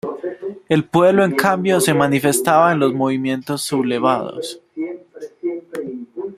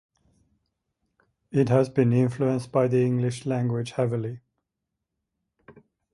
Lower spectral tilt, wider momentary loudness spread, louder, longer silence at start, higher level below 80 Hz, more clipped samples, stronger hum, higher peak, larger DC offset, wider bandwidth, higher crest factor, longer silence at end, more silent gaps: second, -5 dB/octave vs -8 dB/octave; first, 15 LU vs 7 LU; first, -17 LUFS vs -24 LUFS; second, 0.05 s vs 1.5 s; about the same, -60 dBFS vs -64 dBFS; neither; neither; first, 0 dBFS vs -6 dBFS; neither; first, 16 kHz vs 11.5 kHz; about the same, 18 dB vs 20 dB; second, 0 s vs 1.75 s; neither